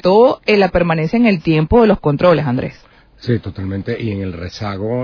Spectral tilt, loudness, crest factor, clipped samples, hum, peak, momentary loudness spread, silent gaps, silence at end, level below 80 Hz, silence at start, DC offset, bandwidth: -8 dB/octave; -15 LUFS; 14 dB; under 0.1%; none; 0 dBFS; 13 LU; none; 0 s; -34 dBFS; 0 s; under 0.1%; 5.4 kHz